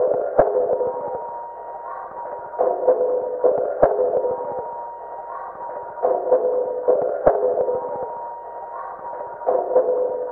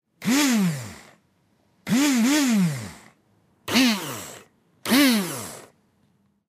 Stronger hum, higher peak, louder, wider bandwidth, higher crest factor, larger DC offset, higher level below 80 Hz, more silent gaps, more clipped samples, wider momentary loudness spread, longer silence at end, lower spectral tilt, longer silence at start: neither; first, 0 dBFS vs -6 dBFS; about the same, -22 LUFS vs -21 LUFS; second, 2.3 kHz vs 16 kHz; about the same, 22 dB vs 18 dB; neither; first, -50 dBFS vs -66 dBFS; neither; neither; second, 14 LU vs 21 LU; second, 0 s vs 0.85 s; first, -11 dB/octave vs -3.5 dB/octave; second, 0 s vs 0.2 s